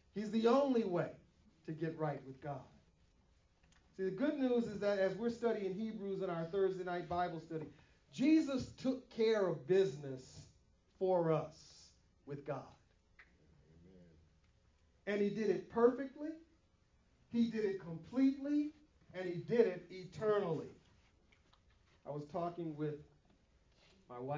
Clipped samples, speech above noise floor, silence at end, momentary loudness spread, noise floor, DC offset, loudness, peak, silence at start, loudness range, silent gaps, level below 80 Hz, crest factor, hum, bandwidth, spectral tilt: under 0.1%; 36 dB; 0 s; 17 LU; -73 dBFS; under 0.1%; -38 LUFS; -18 dBFS; 0.15 s; 9 LU; none; -72 dBFS; 22 dB; none; 7.6 kHz; -7 dB/octave